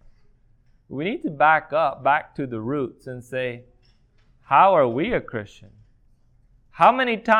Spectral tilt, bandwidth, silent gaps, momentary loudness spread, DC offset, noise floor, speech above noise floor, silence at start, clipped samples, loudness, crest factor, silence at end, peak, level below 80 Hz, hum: -6.5 dB/octave; 11 kHz; none; 17 LU; under 0.1%; -58 dBFS; 37 dB; 0.9 s; under 0.1%; -21 LUFS; 20 dB; 0 s; -2 dBFS; -54 dBFS; none